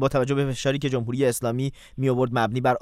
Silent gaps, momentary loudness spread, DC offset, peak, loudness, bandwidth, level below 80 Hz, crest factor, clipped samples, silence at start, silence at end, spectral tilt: none; 5 LU; under 0.1%; -8 dBFS; -24 LUFS; 16 kHz; -50 dBFS; 16 dB; under 0.1%; 0 s; 0 s; -6 dB/octave